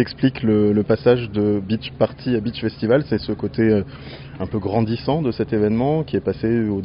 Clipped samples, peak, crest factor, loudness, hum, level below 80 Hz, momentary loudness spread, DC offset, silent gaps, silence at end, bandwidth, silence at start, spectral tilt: under 0.1%; -2 dBFS; 16 dB; -20 LUFS; none; -44 dBFS; 8 LU; under 0.1%; none; 0 s; 5.4 kHz; 0 s; -7 dB/octave